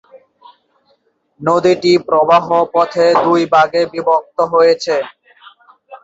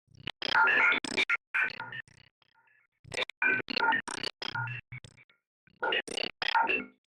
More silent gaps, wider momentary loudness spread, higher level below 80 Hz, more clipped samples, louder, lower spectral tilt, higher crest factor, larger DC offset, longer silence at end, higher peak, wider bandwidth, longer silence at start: second, none vs 1.47-1.54 s, 2.31-2.42 s, 2.88-2.92 s, 2.99-3.04 s, 3.37-3.42 s, 5.24-5.29 s, 5.47-5.67 s; second, 5 LU vs 17 LU; first, -60 dBFS vs -70 dBFS; neither; first, -13 LUFS vs -29 LUFS; first, -5.5 dB/octave vs -2.5 dB/octave; about the same, 14 dB vs 18 dB; neither; second, 0.05 s vs 0.25 s; first, 0 dBFS vs -14 dBFS; second, 8 kHz vs 12.5 kHz; first, 1.4 s vs 0.55 s